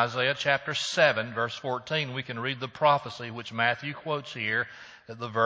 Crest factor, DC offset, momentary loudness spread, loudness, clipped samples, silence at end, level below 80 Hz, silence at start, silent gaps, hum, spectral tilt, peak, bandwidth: 22 dB; under 0.1%; 13 LU; -28 LUFS; under 0.1%; 0 s; -70 dBFS; 0 s; none; none; -4 dB/octave; -6 dBFS; 8 kHz